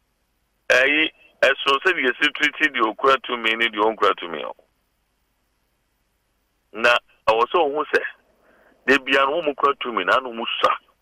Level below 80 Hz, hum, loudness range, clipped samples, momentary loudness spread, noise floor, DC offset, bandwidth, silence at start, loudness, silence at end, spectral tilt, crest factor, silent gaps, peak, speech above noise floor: -60 dBFS; none; 6 LU; under 0.1%; 7 LU; -69 dBFS; under 0.1%; 15.5 kHz; 0.7 s; -20 LUFS; 0.25 s; -2.5 dB/octave; 16 dB; none; -6 dBFS; 49 dB